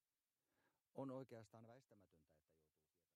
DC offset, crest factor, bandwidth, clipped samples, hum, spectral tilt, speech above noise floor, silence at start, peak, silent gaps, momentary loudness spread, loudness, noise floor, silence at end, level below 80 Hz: under 0.1%; 22 dB; 13 kHz; under 0.1%; none; -8 dB/octave; over 31 dB; 0.95 s; -40 dBFS; none; 13 LU; -57 LUFS; under -90 dBFS; 0.8 s; under -90 dBFS